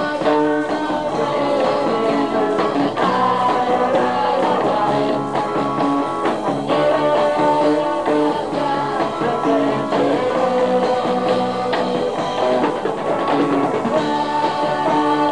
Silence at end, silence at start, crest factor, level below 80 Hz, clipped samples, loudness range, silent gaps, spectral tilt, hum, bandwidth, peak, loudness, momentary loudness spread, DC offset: 0 s; 0 s; 12 dB; -54 dBFS; under 0.1%; 1 LU; none; -6 dB/octave; none; 10.5 kHz; -4 dBFS; -18 LUFS; 4 LU; 0.5%